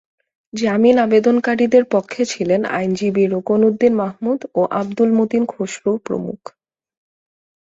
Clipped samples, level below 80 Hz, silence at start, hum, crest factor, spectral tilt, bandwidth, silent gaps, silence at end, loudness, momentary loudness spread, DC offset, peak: under 0.1%; -60 dBFS; 0.55 s; none; 16 dB; -6 dB/octave; 7.8 kHz; none; 1.25 s; -17 LUFS; 9 LU; under 0.1%; -2 dBFS